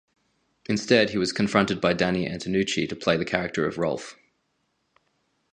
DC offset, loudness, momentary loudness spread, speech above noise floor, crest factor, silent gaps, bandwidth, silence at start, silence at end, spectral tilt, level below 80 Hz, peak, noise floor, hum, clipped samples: under 0.1%; -24 LUFS; 8 LU; 49 dB; 24 dB; none; 10 kHz; 0.7 s; 1.4 s; -5 dB/octave; -56 dBFS; -2 dBFS; -73 dBFS; none; under 0.1%